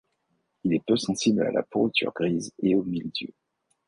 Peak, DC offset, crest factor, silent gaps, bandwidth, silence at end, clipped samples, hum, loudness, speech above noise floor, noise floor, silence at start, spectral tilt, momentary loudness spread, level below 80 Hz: -10 dBFS; under 0.1%; 16 dB; none; 11 kHz; 0.6 s; under 0.1%; none; -26 LUFS; 49 dB; -74 dBFS; 0.65 s; -5 dB/octave; 9 LU; -62 dBFS